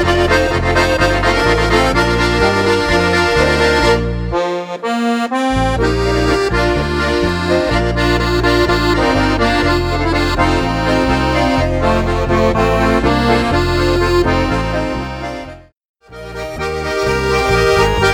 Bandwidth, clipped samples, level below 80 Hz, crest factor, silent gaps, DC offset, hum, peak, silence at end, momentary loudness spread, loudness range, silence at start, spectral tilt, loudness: 18 kHz; under 0.1%; -24 dBFS; 14 dB; 15.85-15.94 s; under 0.1%; none; 0 dBFS; 0 s; 7 LU; 5 LU; 0 s; -5.5 dB/octave; -14 LUFS